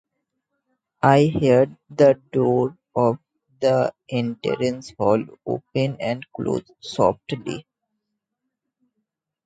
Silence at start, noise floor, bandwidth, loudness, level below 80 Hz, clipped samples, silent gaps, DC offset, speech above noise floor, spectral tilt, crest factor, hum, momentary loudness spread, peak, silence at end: 1.05 s; -80 dBFS; 9.2 kHz; -21 LUFS; -56 dBFS; under 0.1%; none; under 0.1%; 60 dB; -7 dB/octave; 22 dB; none; 12 LU; -2 dBFS; 1.85 s